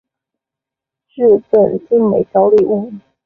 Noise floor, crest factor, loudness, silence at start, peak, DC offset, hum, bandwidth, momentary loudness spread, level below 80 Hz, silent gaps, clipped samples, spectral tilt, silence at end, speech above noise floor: -85 dBFS; 12 dB; -13 LUFS; 1.15 s; -2 dBFS; under 0.1%; none; 3.5 kHz; 6 LU; -54 dBFS; none; under 0.1%; -10.5 dB/octave; 0.25 s; 73 dB